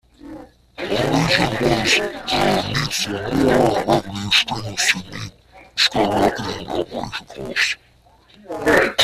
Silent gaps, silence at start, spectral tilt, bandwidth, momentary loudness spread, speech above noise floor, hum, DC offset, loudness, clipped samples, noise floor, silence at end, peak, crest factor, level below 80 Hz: none; 0.25 s; -3.5 dB/octave; 15.5 kHz; 14 LU; 33 dB; none; under 0.1%; -19 LUFS; under 0.1%; -52 dBFS; 0 s; -2 dBFS; 18 dB; -44 dBFS